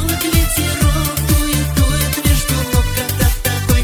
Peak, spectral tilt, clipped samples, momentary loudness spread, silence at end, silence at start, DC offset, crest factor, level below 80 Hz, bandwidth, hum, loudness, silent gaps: 0 dBFS; -4 dB/octave; under 0.1%; 2 LU; 0 s; 0 s; under 0.1%; 14 dB; -20 dBFS; 20 kHz; none; -15 LUFS; none